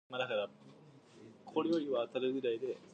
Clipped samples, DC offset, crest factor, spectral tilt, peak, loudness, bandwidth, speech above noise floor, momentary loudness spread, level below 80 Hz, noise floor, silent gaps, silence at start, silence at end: under 0.1%; under 0.1%; 18 dB; -6 dB/octave; -20 dBFS; -37 LUFS; 8.8 kHz; 23 dB; 7 LU; -88 dBFS; -59 dBFS; none; 0.1 s; 0.1 s